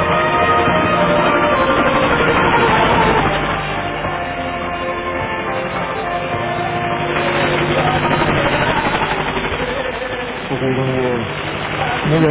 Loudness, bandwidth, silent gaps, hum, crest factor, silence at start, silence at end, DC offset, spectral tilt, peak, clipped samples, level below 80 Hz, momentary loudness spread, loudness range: -16 LUFS; 4 kHz; none; none; 16 dB; 0 s; 0 s; under 0.1%; -9.5 dB/octave; -2 dBFS; under 0.1%; -34 dBFS; 8 LU; 6 LU